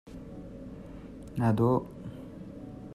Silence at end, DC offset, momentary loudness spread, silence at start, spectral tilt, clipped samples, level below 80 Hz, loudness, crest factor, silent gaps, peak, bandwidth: 0 s; under 0.1%; 19 LU; 0.05 s; -9.5 dB/octave; under 0.1%; -52 dBFS; -28 LUFS; 18 dB; none; -14 dBFS; 13 kHz